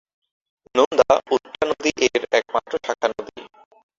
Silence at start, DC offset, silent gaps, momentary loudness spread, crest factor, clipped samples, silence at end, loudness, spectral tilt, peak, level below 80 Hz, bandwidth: 0.75 s; under 0.1%; 0.86-0.91 s; 8 LU; 22 dB; under 0.1%; 0.5 s; -21 LUFS; -2.5 dB/octave; 0 dBFS; -58 dBFS; 7.6 kHz